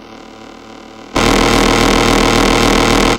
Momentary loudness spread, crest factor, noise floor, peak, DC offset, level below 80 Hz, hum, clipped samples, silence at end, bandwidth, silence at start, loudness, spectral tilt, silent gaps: 2 LU; 12 dB; -34 dBFS; 0 dBFS; under 0.1%; -24 dBFS; none; under 0.1%; 0 s; 17 kHz; 0.05 s; -11 LUFS; -4 dB/octave; none